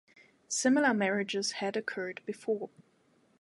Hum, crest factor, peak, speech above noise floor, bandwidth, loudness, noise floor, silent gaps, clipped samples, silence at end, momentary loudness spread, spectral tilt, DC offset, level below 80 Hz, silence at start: none; 18 dB; -14 dBFS; 37 dB; 11.5 kHz; -31 LUFS; -68 dBFS; none; under 0.1%; 0.75 s; 12 LU; -3.5 dB/octave; under 0.1%; -84 dBFS; 0.5 s